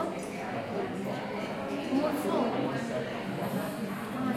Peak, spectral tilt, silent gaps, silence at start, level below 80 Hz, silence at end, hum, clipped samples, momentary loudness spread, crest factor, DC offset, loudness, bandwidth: -16 dBFS; -6 dB/octave; none; 0 s; -66 dBFS; 0 s; none; under 0.1%; 6 LU; 16 dB; under 0.1%; -33 LUFS; 16.5 kHz